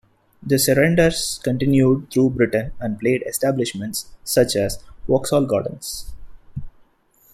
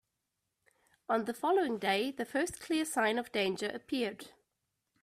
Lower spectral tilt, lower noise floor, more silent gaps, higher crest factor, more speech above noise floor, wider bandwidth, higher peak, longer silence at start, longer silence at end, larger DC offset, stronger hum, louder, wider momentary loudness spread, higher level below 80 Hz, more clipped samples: first, -5 dB/octave vs -3.5 dB/octave; second, -57 dBFS vs -85 dBFS; neither; about the same, 18 dB vs 20 dB; second, 38 dB vs 52 dB; about the same, 15.5 kHz vs 15.5 kHz; first, -2 dBFS vs -16 dBFS; second, 0.4 s vs 1.1 s; about the same, 0.65 s vs 0.75 s; neither; neither; first, -20 LUFS vs -33 LUFS; first, 16 LU vs 8 LU; first, -42 dBFS vs -72 dBFS; neither